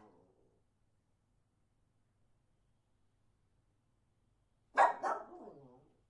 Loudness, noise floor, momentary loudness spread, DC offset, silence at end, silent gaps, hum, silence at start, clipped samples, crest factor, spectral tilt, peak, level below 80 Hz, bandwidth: -34 LUFS; -77 dBFS; 22 LU; under 0.1%; 0.6 s; none; none; 4.75 s; under 0.1%; 28 dB; -3 dB/octave; -14 dBFS; -82 dBFS; 10.5 kHz